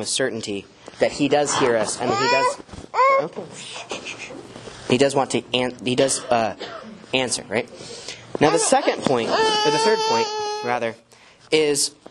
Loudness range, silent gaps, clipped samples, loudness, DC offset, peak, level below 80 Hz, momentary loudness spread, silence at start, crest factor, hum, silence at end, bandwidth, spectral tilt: 3 LU; none; under 0.1%; -21 LUFS; under 0.1%; -2 dBFS; -58 dBFS; 16 LU; 0 s; 20 dB; none; 0.2 s; 12 kHz; -3 dB/octave